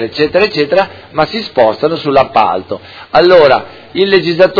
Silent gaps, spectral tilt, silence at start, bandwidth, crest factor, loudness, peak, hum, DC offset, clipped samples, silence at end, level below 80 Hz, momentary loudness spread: none; -6.5 dB/octave; 0 s; 5.4 kHz; 10 dB; -11 LUFS; 0 dBFS; none; under 0.1%; 1%; 0 s; -46 dBFS; 11 LU